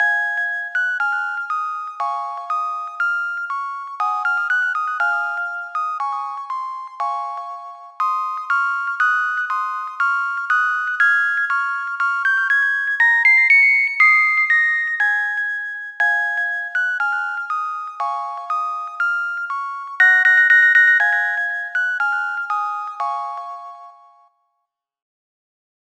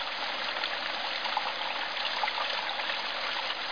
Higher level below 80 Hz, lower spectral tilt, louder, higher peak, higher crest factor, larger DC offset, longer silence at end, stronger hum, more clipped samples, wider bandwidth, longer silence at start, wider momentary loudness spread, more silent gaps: second, under -90 dBFS vs -72 dBFS; second, 6.5 dB/octave vs -1 dB/octave; first, -17 LUFS vs -31 LUFS; first, -4 dBFS vs -16 dBFS; about the same, 16 dB vs 18 dB; second, under 0.1% vs 0.4%; first, 2.1 s vs 0 s; neither; neither; first, 11 kHz vs 5.4 kHz; about the same, 0 s vs 0 s; first, 15 LU vs 2 LU; neither